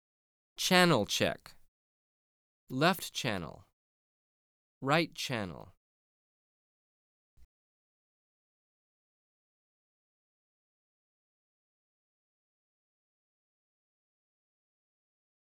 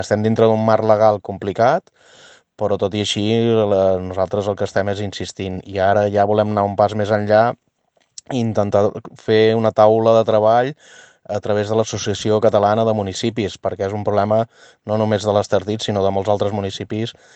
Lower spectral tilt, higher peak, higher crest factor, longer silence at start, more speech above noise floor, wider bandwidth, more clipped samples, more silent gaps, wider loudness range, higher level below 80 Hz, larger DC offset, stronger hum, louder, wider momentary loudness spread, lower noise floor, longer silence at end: second, -4 dB/octave vs -6 dB/octave; second, -10 dBFS vs 0 dBFS; first, 28 dB vs 18 dB; first, 0.6 s vs 0 s; first, over 59 dB vs 46 dB; first, over 20 kHz vs 8.8 kHz; neither; first, 1.68-2.67 s, 3.73-4.81 s, 5.77-7.37 s vs none; first, 7 LU vs 3 LU; second, -70 dBFS vs -60 dBFS; neither; neither; second, -30 LUFS vs -18 LUFS; first, 18 LU vs 11 LU; first, under -90 dBFS vs -63 dBFS; first, 8 s vs 0.25 s